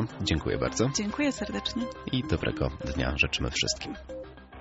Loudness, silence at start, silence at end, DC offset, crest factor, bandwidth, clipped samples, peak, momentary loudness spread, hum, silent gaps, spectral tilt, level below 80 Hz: -29 LUFS; 0 s; 0 s; under 0.1%; 20 dB; 8 kHz; under 0.1%; -10 dBFS; 11 LU; none; none; -4 dB/octave; -42 dBFS